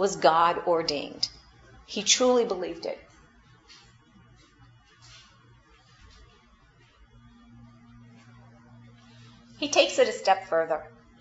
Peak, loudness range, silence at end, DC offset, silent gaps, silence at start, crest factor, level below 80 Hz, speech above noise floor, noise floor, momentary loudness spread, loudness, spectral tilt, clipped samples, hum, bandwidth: -6 dBFS; 16 LU; 0.35 s; under 0.1%; none; 0 s; 24 dB; -62 dBFS; 34 dB; -59 dBFS; 14 LU; -25 LUFS; -2 dB/octave; under 0.1%; none; 8 kHz